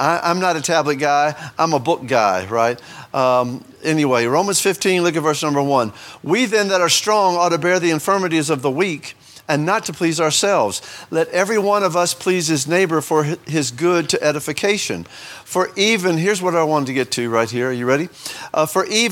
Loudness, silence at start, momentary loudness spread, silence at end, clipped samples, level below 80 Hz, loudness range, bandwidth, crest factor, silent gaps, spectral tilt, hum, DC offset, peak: -18 LUFS; 0 s; 7 LU; 0 s; under 0.1%; -64 dBFS; 2 LU; 18 kHz; 18 dB; none; -3.5 dB/octave; none; under 0.1%; 0 dBFS